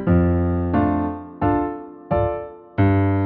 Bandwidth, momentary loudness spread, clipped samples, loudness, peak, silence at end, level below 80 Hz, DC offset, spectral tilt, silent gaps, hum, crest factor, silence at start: 4.1 kHz; 11 LU; under 0.1%; -21 LUFS; -6 dBFS; 0 s; -36 dBFS; under 0.1%; -9 dB/octave; none; none; 14 dB; 0 s